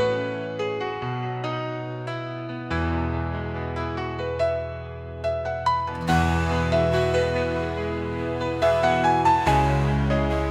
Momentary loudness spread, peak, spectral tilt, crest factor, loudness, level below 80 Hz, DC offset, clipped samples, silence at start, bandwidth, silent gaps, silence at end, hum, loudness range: 11 LU; -6 dBFS; -6.5 dB/octave; 18 dB; -24 LUFS; -38 dBFS; under 0.1%; under 0.1%; 0 s; 13.5 kHz; none; 0 s; none; 6 LU